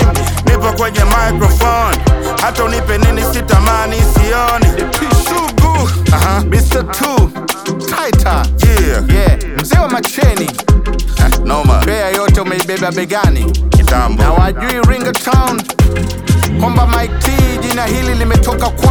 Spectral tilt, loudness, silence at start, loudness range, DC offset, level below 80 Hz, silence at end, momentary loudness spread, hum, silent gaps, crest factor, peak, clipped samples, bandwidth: -5.5 dB/octave; -12 LUFS; 0 s; 1 LU; under 0.1%; -14 dBFS; 0 s; 4 LU; none; none; 10 dB; 0 dBFS; under 0.1%; over 20 kHz